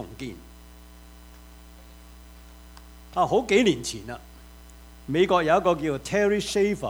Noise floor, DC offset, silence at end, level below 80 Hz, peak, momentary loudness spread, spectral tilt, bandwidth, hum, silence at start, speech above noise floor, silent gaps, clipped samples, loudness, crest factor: -47 dBFS; under 0.1%; 0 s; -48 dBFS; -6 dBFS; 19 LU; -4.5 dB/octave; over 20 kHz; 60 Hz at -50 dBFS; 0 s; 24 dB; none; under 0.1%; -23 LUFS; 20 dB